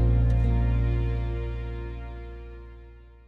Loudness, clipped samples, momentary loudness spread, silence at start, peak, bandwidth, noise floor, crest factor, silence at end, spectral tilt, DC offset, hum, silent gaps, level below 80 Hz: -27 LUFS; under 0.1%; 21 LU; 0 s; -12 dBFS; 4.4 kHz; -47 dBFS; 14 dB; 0.2 s; -10 dB/octave; under 0.1%; none; none; -28 dBFS